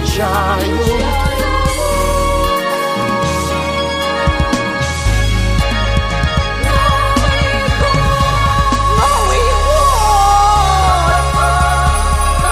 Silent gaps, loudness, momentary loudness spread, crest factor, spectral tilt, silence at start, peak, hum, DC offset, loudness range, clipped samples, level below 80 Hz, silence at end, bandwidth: none; -13 LUFS; 5 LU; 12 dB; -4.5 dB/octave; 0 s; 0 dBFS; none; under 0.1%; 4 LU; under 0.1%; -18 dBFS; 0 s; 15.5 kHz